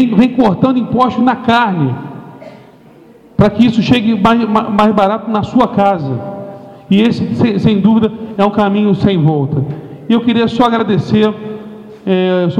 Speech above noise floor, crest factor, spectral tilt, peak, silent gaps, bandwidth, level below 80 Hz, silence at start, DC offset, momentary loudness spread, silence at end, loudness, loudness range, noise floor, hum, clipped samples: 29 dB; 12 dB; -8 dB/octave; 0 dBFS; none; 8 kHz; -42 dBFS; 0 s; under 0.1%; 14 LU; 0 s; -12 LUFS; 2 LU; -40 dBFS; none; under 0.1%